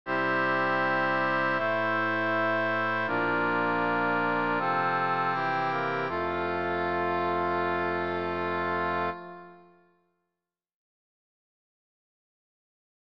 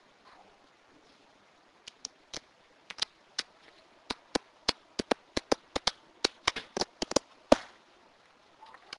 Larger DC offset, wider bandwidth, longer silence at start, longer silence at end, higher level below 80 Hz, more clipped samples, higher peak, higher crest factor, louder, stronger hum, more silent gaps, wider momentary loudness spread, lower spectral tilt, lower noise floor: first, 0.3% vs under 0.1%; second, 7.6 kHz vs 11.5 kHz; second, 0.05 s vs 2.35 s; first, 2.25 s vs 1.3 s; second, -64 dBFS vs -58 dBFS; neither; second, -14 dBFS vs -2 dBFS; second, 14 dB vs 36 dB; first, -27 LUFS vs -33 LUFS; neither; neither; second, 4 LU vs 20 LU; first, -7 dB/octave vs -2 dB/octave; first, -88 dBFS vs -62 dBFS